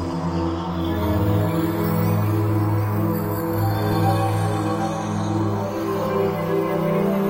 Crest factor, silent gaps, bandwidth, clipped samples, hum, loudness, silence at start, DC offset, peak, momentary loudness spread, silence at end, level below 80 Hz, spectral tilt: 12 dB; none; 16 kHz; under 0.1%; none; -22 LUFS; 0 s; under 0.1%; -8 dBFS; 4 LU; 0 s; -44 dBFS; -7.5 dB/octave